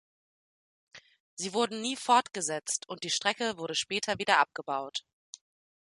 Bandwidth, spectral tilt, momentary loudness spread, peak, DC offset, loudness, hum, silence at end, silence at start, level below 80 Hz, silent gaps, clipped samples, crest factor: 11.5 kHz; -1.5 dB/octave; 20 LU; -8 dBFS; under 0.1%; -30 LUFS; none; 0.9 s; 0.95 s; -74 dBFS; 1.20-1.37 s; under 0.1%; 24 dB